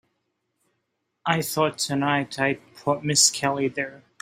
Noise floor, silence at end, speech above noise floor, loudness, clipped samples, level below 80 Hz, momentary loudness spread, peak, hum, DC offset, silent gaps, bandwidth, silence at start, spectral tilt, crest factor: -77 dBFS; 0.25 s; 53 dB; -23 LUFS; under 0.1%; -66 dBFS; 12 LU; -4 dBFS; none; under 0.1%; none; 16 kHz; 1.25 s; -3 dB/octave; 22 dB